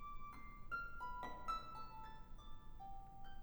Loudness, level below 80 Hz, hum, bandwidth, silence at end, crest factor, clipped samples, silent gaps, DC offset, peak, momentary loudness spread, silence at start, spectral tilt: -52 LUFS; -56 dBFS; none; over 20 kHz; 0 s; 16 dB; under 0.1%; none; under 0.1%; -32 dBFS; 14 LU; 0 s; -5 dB/octave